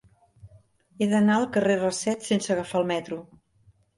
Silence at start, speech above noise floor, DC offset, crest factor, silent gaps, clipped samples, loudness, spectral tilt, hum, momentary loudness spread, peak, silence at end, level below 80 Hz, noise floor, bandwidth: 0.45 s; 37 dB; under 0.1%; 16 dB; none; under 0.1%; -25 LUFS; -5 dB/octave; none; 9 LU; -10 dBFS; 0.75 s; -64 dBFS; -61 dBFS; 11.5 kHz